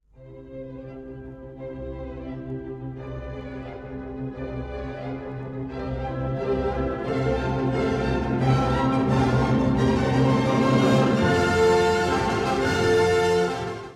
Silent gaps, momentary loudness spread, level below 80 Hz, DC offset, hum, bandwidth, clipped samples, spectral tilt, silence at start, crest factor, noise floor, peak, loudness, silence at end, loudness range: none; 17 LU; -40 dBFS; under 0.1%; none; 12.5 kHz; under 0.1%; -6.5 dB/octave; 0.2 s; 16 dB; -45 dBFS; -8 dBFS; -23 LUFS; 0 s; 15 LU